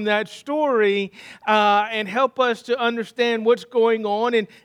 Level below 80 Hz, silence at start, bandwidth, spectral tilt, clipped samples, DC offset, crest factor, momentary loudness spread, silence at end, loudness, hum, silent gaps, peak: -76 dBFS; 0 s; 12 kHz; -4.5 dB/octave; under 0.1%; under 0.1%; 16 dB; 5 LU; 0.2 s; -20 LUFS; none; none; -4 dBFS